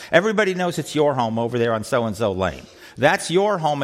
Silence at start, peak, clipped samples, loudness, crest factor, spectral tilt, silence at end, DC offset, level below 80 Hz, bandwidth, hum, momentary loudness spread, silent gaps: 0 s; -2 dBFS; under 0.1%; -20 LUFS; 18 dB; -5 dB/octave; 0 s; under 0.1%; -54 dBFS; 16 kHz; none; 6 LU; none